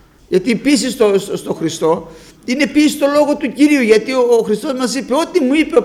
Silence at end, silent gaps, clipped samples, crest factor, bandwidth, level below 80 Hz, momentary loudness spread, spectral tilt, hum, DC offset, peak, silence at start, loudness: 0 s; none; under 0.1%; 14 dB; 15 kHz; -50 dBFS; 7 LU; -4.5 dB/octave; none; under 0.1%; 0 dBFS; 0.3 s; -14 LUFS